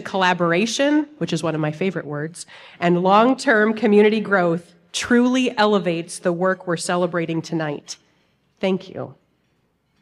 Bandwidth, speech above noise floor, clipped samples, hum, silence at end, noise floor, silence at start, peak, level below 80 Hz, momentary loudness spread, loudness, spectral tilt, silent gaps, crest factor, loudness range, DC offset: 12.5 kHz; 46 dB; under 0.1%; none; 0.9 s; -66 dBFS; 0 s; -4 dBFS; -64 dBFS; 14 LU; -20 LUFS; -5 dB/octave; none; 18 dB; 7 LU; under 0.1%